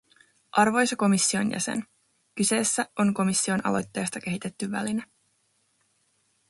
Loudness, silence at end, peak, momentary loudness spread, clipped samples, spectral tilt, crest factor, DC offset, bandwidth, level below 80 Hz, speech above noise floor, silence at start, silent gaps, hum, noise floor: -25 LUFS; 1.45 s; -6 dBFS; 10 LU; under 0.1%; -3.5 dB/octave; 20 dB; under 0.1%; 11.5 kHz; -66 dBFS; 45 dB; 0.55 s; none; none; -70 dBFS